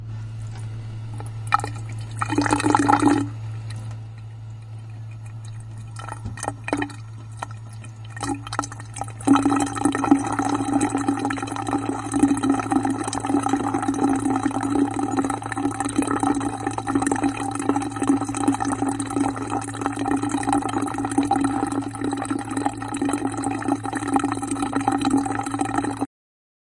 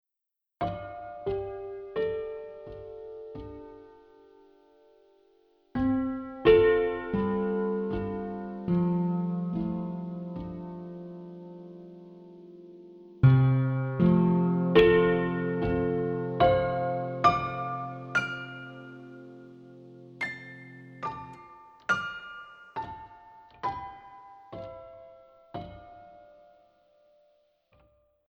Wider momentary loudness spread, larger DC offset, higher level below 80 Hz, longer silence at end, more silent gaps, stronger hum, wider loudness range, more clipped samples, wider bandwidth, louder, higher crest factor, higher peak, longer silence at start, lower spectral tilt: second, 15 LU vs 26 LU; neither; about the same, -48 dBFS vs -52 dBFS; second, 0.7 s vs 2.1 s; neither; neither; second, 9 LU vs 18 LU; neither; first, 11.5 kHz vs 7 kHz; first, -24 LUFS vs -28 LUFS; about the same, 22 dB vs 22 dB; first, -2 dBFS vs -8 dBFS; second, 0 s vs 0.6 s; second, -5.5 dB/octave vs -8.5 dB/octave